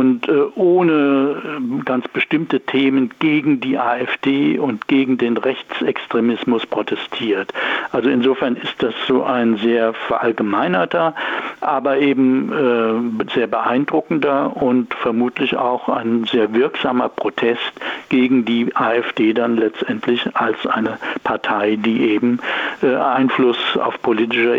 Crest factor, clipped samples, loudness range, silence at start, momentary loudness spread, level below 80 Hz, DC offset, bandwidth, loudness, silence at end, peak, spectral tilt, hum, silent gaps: 12 dB; under 0.1%; 2 LU; 0 s; 5 LU; -62 dBFS; under 0.1%; 7.2 kHz; -18 LUFS; 0 s; -6 dBFS; -7 dB/octave; none; none